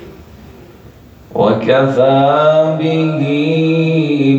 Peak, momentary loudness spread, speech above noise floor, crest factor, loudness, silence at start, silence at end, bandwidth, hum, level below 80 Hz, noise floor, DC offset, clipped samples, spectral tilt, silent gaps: 0 dBFS; 5 LU; 27 dB; 12 dB; -12 LUFS; 0 s; 0 s; 7.8 kHz; none; -48 dBFS; -39 dBFS; under 0.1%; under 0.1%; -8 dB/octave; none